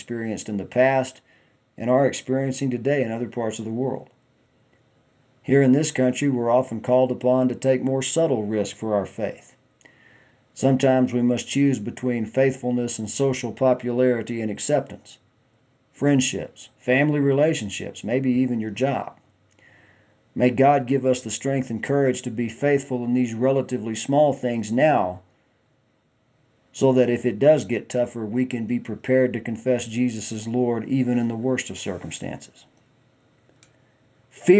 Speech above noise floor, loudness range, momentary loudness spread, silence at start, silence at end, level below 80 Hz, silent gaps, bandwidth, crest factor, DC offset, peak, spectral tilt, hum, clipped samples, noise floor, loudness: 43 dB; 4 LU; 11 LU; 0 s; 0 s; -60 dBFS; none; 8 kHz; 20 dB; under 0.1%; -2 dBFS; -6 dB/octave; none; under 0.1%; -65 dBFS; -23 LUFS